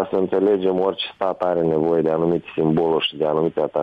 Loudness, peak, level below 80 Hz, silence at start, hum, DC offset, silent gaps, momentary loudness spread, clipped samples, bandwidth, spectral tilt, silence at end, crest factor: -20 LUFS; -8 dBFS; -56 dBFS; 0 s; none; under 0.1%; none; 4 LU; under 0.1%; 5 kHz; -8.5 dB/octave; 0 s; 12 dB